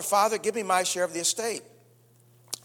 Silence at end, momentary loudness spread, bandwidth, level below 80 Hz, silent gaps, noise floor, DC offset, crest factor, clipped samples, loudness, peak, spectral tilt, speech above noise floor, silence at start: 0.1 s; 11 LU; 19.5 kHz; -78 dBFS; none; -59 dBFS; under 0.1%; 20 dB; under 0.1%; -26 LUFS; -8 dBFS; -1.5 dB/octave; 32 dB; 0 s